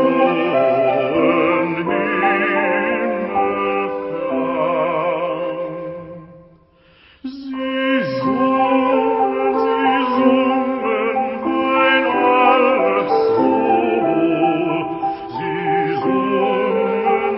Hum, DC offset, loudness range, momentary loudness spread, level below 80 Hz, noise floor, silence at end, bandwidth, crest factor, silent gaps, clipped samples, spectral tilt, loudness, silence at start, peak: none; under 0.1%; 7 LU; 9 LU; -56 dBFS; -51 dBFS; 0 s; 5.8 kHz; 16 dB; none; under 0.1%; -10.5 dB/octave; -17 LUFS; 0 s; -2 dBFS